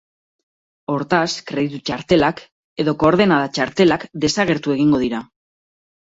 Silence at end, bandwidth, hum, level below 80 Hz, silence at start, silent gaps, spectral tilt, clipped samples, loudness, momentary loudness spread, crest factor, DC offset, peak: 0.8 s; 7.8 kHz; none; -50 dBFS; 0.9 s; 2.52-2.76 s; -5.5 dB/octave; under 0.1%; -18 LUFS; 10 LU; 18 dB; under 0.1%; -2 dBFS